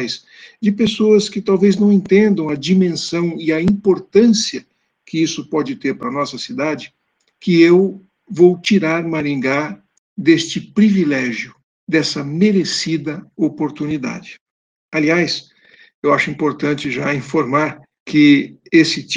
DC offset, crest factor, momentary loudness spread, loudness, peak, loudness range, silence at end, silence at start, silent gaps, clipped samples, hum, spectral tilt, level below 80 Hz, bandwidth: under 0.1%; 16 dB; 11 LU; -16 LUFS; 0 dBFS; 5 LU; 0 s; 0 s; 9.98-10.16 s, 11.63-11.87 s, 14.41-14.89 s, 15.94-16.02 s, 18.00-18.06 s; under 0.1%; none; -5.5 dB/octave; -56 dBFS; 9.8 kHz